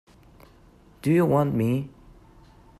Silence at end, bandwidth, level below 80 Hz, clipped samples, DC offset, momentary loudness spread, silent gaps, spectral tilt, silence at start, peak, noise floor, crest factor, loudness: 0.9 s; 14 kHz; -54 dBFS; under 0.1%; under 0.1%; 10 LU; none; -8.5 dB/octave; 1.05 s; -10 dBFS; -54 dBFS; 16 dB; -23 LUFS